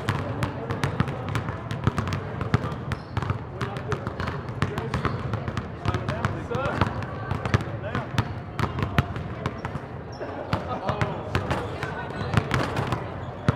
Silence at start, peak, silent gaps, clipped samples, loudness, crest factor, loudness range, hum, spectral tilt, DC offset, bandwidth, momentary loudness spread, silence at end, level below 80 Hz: 0 s; 0 dBFS; none; under 0.1%; -29 LUFS; 28 dB; 2 LU; none; -6.5 dB/octave; under 0.1%; 14 kHz; 6 LU; 0 s; -44 dBFS